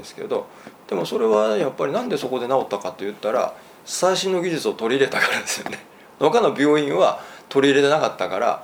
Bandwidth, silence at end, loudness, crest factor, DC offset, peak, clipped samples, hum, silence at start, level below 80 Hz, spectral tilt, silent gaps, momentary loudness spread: over 20 kHz; 0 s; -21 LUFS; 18 dB; under 0.1%; -2 dBFS; under 0.1%; none; 0 s; -70 dBFS; -4 dB/octave; none; 11 LU